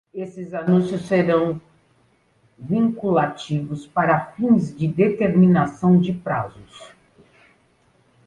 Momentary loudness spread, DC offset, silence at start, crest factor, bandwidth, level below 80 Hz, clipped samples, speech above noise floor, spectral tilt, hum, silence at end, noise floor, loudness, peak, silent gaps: 11 LU; under 0.1%; 0.15 s; 16 dB; 9.4 kHz; -56 dBFS; under 0.1%; 41 dB; -8.5 dB/octave; none; 1.4 s; -61 dBFS; -20 LUFS; -4 dBFS; none